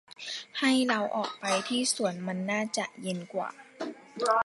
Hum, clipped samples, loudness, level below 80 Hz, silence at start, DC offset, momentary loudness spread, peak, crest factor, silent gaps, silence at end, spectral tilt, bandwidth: none; under 0.1%; -30 LUFS; -82 dBFS; 0.2 s; under 0.1%; 13 LU; -12 dBFS; 18 dB; none; 0 s; -3.5 dB/octave; 11.5 kHz